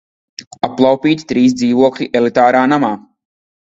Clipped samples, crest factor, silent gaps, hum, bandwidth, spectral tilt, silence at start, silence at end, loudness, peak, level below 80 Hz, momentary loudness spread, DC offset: under 0.1%; 14 dB; 0.47-0.51 s; none; 7.8 kHz; -5.5 dB/octave; 0.4 s; 0.65 s; -13 LUFS; 0 dBFS; -54 dBFS; 17 LU; under 0.1%